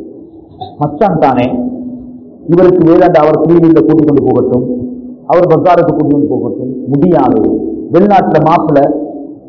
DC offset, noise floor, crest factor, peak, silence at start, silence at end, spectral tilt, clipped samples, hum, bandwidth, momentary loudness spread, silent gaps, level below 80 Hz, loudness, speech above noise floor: under 0.1%; -32 dBFS; 10 dB; 0 dBFS; 0 s; 0.1 s; -10 dB/octave; 3%; none; 6 kHz; 15 LU; none; -40 dBFS; -9 LUFS; 25 dB